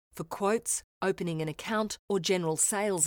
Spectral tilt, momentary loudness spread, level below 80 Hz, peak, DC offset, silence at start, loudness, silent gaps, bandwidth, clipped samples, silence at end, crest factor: -3.5 dB/octave; 7 LU; -64 dBFS; -12 dBFS; under 0.1%; 0.15 s; -30 LUFS; 0.84-1.01 s, 1.99-2.08 s; over 20 kHz; under 0.1%; 0 s; 18 dB